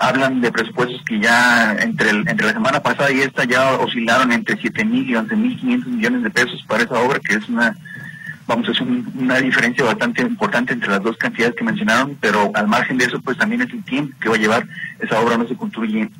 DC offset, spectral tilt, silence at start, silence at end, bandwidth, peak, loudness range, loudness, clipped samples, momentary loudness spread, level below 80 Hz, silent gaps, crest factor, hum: under 0.1%; -4.5 dB/octave; 0 s; 0 s; 16.5 kHz; 0 dBFS; 3 LU; -17 LUFS; under 0.1%; 7 LU; -60 dBFS; none; 18 dB; none